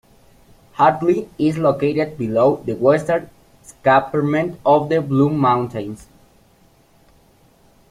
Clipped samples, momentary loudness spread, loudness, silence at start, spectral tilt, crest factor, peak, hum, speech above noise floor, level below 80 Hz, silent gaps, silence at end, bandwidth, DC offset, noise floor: under 0.1%; 7 LU; -18 LUFS; 0.8 s; -7.5 dB/octave; 18 dB; -2 dBFS; none; 37 dB; -54 dBFS; none; 1.85 s; 14 kHz; under 0.1%; -54 dBFS